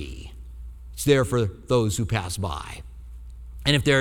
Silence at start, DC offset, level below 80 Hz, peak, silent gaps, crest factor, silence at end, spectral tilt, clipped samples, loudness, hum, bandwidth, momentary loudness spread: 0 s; under 0.1%; -40 dBFS; -6 dBFS; none; 20 dB; 0 s; -5 dB/octave; under 0.1%; -24 LUFS; none; 17.5 kHz; 22 LU